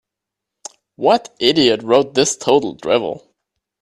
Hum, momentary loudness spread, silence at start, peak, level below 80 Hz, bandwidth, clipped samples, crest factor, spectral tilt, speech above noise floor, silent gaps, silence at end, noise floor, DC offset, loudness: none; 22 LU; 1 s; 0 dBFS; -58 dBFS; 13 kHz; under 0.1%; 18 dB; -3.5 dB/octave; 67 dB; none; 0.65 s; -83 dBFS; under 0.1%; -16 LUFS